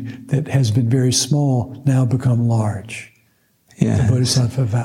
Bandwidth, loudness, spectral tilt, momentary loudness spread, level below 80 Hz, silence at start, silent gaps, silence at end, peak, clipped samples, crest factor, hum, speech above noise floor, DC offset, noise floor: 13.5 kHz; -18 LUFS; -5.5 dB/octave; 7 LU; -50 dBFS; 0 s; none; 0 s; -2 dBFS; under 0.1%; 16 dB; none; 43 dB; under 0.1%; -60 dBFS